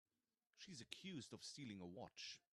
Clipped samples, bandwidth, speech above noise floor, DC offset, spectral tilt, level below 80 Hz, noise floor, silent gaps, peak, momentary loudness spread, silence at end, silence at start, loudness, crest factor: under 0.1%; 12.5 kHz; over 34 dB; under 0.1%; -3.5 dB/octave; -90 dBFS; under -90 dBFS; none; -32 dBFS; 5 LU; 0.15 s; 0.55 s; -56 LUFS; 26 dB